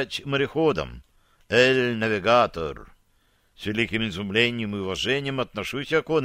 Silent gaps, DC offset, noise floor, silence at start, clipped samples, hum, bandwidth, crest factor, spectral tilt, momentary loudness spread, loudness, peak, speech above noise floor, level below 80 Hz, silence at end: none; under 0.1%; -64 dBFS; 0 s; under 0.1%; none; 15.5 kHz; 20 dB; -5 dB/octave; 11 LU; -24 LUFS; -4 dBFS; 40 dB; -50 dBFS; 0 s